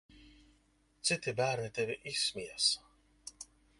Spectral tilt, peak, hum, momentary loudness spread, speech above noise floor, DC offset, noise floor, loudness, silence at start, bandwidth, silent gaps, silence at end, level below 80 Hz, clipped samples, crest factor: -2 dB/octave; -16 dBFS; none; 19 LU; 36 dB; under 0.1%; -71 dBFS; -34 LUFS; 0.15 s; 11.5 kHz; none; 0.35 s; -68 dBFS; under 0.1%; 22 dB